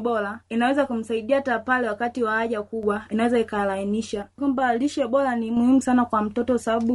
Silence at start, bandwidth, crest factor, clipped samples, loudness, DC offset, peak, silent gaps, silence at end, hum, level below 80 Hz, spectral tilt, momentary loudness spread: 0 s; 11.5 kHz; 14 dB; under 0.1%; -23 LUFS; under 0.1%; -8 dBFS; none; 0 s; none; -58 dBFS; -5.5 dB/octave; 7 LU